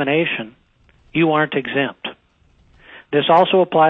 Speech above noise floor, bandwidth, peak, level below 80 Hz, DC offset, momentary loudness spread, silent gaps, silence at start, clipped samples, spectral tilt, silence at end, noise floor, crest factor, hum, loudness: 40 dB; 5.4 kHz; -2 dBFS; -58 dBFS; under 0.1%; 16 LU; none; 0 s; under 0.1%; -8 dB/octave; 0 s; -56 dBFS; 18 dB; none; -18 LUFS